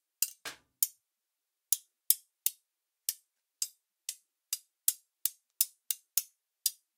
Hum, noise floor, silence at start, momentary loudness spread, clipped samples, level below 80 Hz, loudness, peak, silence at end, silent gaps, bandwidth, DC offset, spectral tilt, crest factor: none; -87 dBFS; 0.2 s; 14 LU; under 0.1%; under -90 dBFS; -34 LUFS; -4 dBFS; 0.25 s; none; 18 kHz; under 0.1%; 4.5 dB/octave; 34 dB